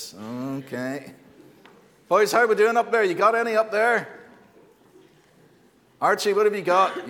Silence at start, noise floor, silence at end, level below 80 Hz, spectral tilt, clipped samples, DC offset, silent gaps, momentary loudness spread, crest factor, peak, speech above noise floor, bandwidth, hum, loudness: 0 s; -58 dBFS; 0 s; -76 dBFS; -4 dB/octave; under 0.1%; under 0.1%; none; 13 LU; 18 dB; -6 dBFS; 36 dB; 18 kHz; none; -22 LUFS